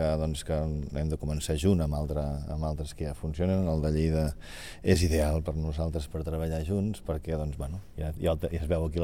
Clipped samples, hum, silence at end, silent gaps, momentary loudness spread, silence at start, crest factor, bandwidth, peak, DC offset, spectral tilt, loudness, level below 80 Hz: under 0.1%; none; 0 s; none; 9 LU; 0 s; 20 dB; 16 kHz; -10 dBFS; 0.4%; -6.5 dB/octave; -30 LUFS; -36 dBFS